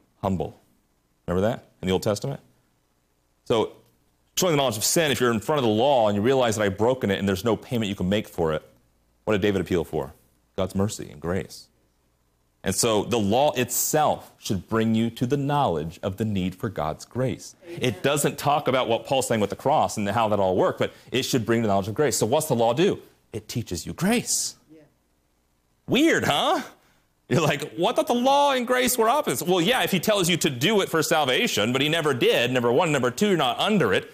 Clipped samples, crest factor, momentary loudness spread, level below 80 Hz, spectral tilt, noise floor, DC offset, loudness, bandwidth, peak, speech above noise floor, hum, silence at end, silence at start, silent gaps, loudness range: under 0.1%; 14 dB; 10 LU; -56 dBFS; -4 dB/octave; -68 dBFS; under 0.1%; -23 LUFS; 15.5 kHz; -10 dBFS; 45 dB; none; 0.05 s; 0.25 s; none; 7 LU